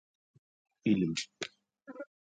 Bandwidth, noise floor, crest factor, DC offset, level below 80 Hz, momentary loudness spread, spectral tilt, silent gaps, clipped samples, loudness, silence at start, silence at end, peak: 9.4 kHz; -51 dBFS; 20 dB; under 0.1%; -68 dBFS; 18 LU; -5 dB/octave; none; under 0.1%; -34 LUFS; 0.85 s; 0.2 s; -16 dBFS